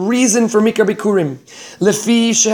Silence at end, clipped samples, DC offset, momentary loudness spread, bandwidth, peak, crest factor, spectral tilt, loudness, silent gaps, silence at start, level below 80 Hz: 0 s; under 0.1%; under 0.1%; 10 LU; 19.5 kHz; 0 dBFS; 14 dB; -3.5 dB/octave; -14 LUFS; none; 0 s; -62 dBFS